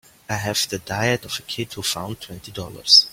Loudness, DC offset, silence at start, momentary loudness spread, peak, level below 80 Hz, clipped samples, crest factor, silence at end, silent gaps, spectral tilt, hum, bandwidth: -21 LUFS; under 0.1%; 0.3 s; 17 LU; 0 dBFS; -54 dBFS; under 0.1%; 22 dB; 0 s; none; -2.5 dB/octave; none; 16.5 kHz